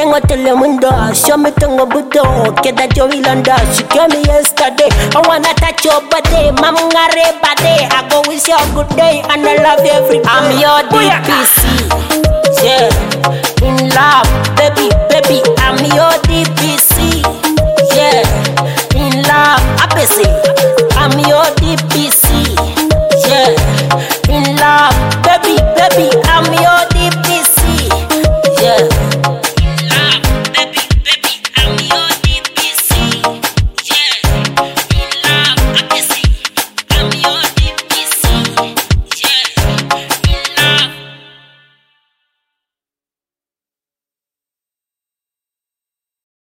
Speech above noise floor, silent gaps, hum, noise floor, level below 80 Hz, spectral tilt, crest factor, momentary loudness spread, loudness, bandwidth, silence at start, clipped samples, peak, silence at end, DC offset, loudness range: over 81 dB; none; none; under -90 dBFS; -20 dBFS; -3.5 dB/octave; 10 dB; 5 LU; -9 LUFS; 17.5 kHz; 0 s; under 0.1%; 0 dBFS; 5.4 s; under 0.1%; 3 LU